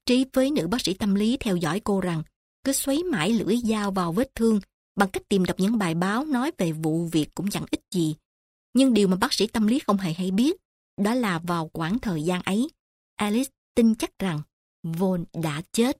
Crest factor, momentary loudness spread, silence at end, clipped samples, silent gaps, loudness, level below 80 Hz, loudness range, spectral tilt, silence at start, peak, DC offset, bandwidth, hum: 18 dB; 7 LU; 0.05 s; under 0.1%; 2.36-2.63 s, 4.74-4.95 s, 8.25-8.73 s, 10.65-10.97 s, 12.80-13.17 s, 13.58-13.75 s, 14.53-14.83 s; -25 LUFS; -52 dBFS; 3 LU; -5.5 dB/octave; 0.05 s; -6 dBFS; under 0.1%; 16 kHz; none